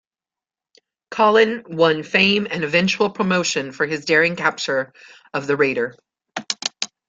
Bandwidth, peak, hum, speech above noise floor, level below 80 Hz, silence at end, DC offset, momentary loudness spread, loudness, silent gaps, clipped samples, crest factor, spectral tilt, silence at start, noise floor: 9.2 kHz; -2 dBFS; none; over 71 dB; -62 dBFS; 0.25 s; under 0.1%; 12 LU; -19 LUFS; none; under 0.1%; 20 dB; -4 dB/octave; 1.1 s; under -90 dBFS